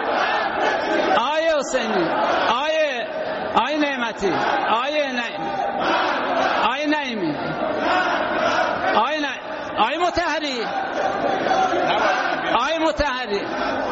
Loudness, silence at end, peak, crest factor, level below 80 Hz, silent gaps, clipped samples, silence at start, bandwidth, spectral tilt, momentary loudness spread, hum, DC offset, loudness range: -21 LUFS; 0 s; -4 dBFS; 16 dB; -48 dBFS; none; under 0.1%; 0 s; 8 kHz; -1.5 dB/octave; 5 LU; none; under 0.1%; 1 LU